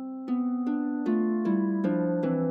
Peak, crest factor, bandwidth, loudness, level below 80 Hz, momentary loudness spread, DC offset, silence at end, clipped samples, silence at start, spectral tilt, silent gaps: -16 dBFS; 12 dB; 5 kHz; -28 LUFS; -74 dBFS; 3 LU; under 0.1%; 0 s; under 0.1%; 0 s; -10.5 dB/octave; none